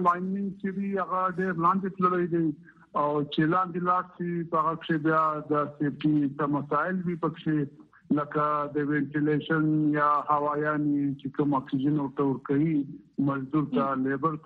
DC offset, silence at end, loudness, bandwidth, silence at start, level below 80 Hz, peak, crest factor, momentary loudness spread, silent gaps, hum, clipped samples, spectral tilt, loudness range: under 0.1%; 0.05 s; -27 LUFS; 4.6 kHz; 0 s; -68 dBFS; -10 dBFS; 16 dB; 6 LU; none; none; under 0.1%; -9.5 dB/octave; 2 LU